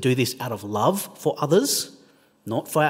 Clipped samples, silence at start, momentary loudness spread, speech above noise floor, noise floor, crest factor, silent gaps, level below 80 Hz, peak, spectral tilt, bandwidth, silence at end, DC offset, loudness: under 0.1%; 0 s; 11 LU; 34 dB; -56 dBFS; 18 dB; none; -70 dBFS; -6 dBFS; -4.5 dB/octave; 16.5 kHz; 0 s; under 0.1%; -24 LUFS